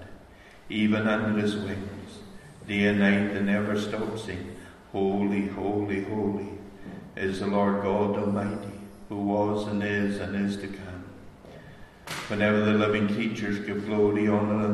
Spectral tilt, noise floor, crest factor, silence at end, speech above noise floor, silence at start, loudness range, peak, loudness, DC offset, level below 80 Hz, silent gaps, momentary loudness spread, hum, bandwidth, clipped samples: -7 dB/octave; -50 dBFS; 18 dB; 0 s; 24 dB; 0 s; 4 LU; -8 dBFS; -27 LUFS; under 0.1%; -54 dBFS; none; 20 LU; none; 12 kHz; under 0.1%